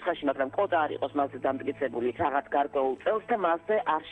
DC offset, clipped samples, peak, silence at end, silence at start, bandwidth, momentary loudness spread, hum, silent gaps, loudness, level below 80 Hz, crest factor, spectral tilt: under 0.1%; under 0.1%; -12 dBFS; 0 s; 0 s; 8.4 kHz; 4 LU; none; none; -29 LUFS; -64 dBFS; 16 dB; -7.5 dB/octave